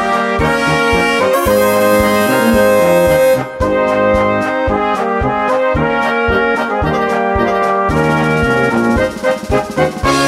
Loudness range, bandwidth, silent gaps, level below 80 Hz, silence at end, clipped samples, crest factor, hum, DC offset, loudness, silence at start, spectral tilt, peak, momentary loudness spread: 3 LU; 16.5 kHz; none; -30 dBFS; 0 s; under 0.1%; 12 dB; none; under 0.1%; -13 LUFS; 0 s; -5.5 dB/octave; 0 dBFS; 5 LU